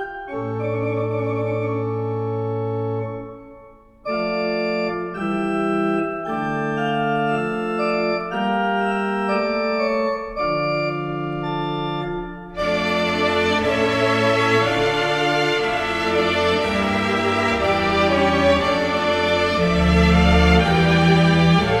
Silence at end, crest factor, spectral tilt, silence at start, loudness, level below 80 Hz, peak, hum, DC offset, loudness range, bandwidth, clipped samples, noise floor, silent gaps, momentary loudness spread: 0 s; 16 dB; -6 dB/octave; 0 s; -20 LUFS; -34 dBFS; -2 dBFS; none; under 0.1%; 8 LU; 12 kHz; under 0.1%; -46 dBFS; none; 10 LU